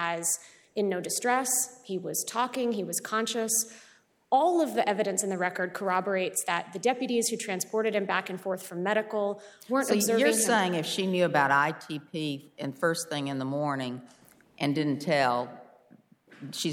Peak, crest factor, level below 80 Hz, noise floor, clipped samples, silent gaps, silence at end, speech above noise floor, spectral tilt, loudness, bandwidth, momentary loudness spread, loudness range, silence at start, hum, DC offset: -10 dBFS; 20 dB; -78 dBFS; -59 dBFS; under 0.1%; none; 0 s; 31 dB; -3.5 dB/octave; -28 LUFS; 19.5 kHz; 10 LU; 5 LU; 0 s; none; under 0.1%